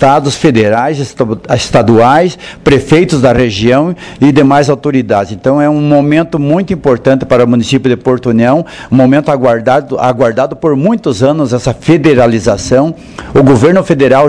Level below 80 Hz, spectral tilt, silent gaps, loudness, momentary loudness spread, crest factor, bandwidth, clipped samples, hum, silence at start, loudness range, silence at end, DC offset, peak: -34 dBFS; -6.5 dB/octave; none; -9 LUFS; 6 LU; 8 dB; 11 kHz; 4%; none; 0 s; 1 LU; 0 s; 0.3%; 0 dBFS